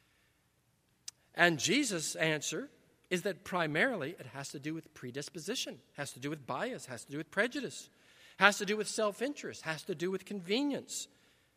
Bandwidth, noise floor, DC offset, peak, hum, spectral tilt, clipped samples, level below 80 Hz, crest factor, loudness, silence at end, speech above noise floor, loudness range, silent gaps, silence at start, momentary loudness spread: 15.5 kHz; -74 dBFS; under 0.1%; -6 dBFS; none; -3 dB/octave; under 0.1%; -80 dBFS; 30 dB; -34 LUFS; 0.5 s; 39 dB; 6 LU; none; 1.35 s; 16 LU